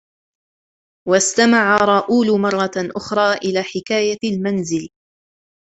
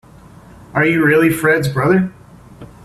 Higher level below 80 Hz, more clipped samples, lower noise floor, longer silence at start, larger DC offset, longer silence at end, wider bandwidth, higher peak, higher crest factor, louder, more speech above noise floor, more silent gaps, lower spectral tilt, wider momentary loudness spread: second, -58 dBFS vs -48 dBFS; neither; first, under -90 dBFS vs -41 dBFS; first, 1.05 s vs 0.75 s; neither; first, 0.9 s vs 0.2 s; second, 8.2 kHz vs 15.5 kHz; about the same, -2 dBFS vs -2 dBFS; about the same, 18 dB vs 14 dB; second, -17 LUFS vs -14 LUFS; first, over 73 dB vs 27 dB; neither; second, -4 dB/octave vs -6.5 dB/octave; first, 11 LU vs 7 LU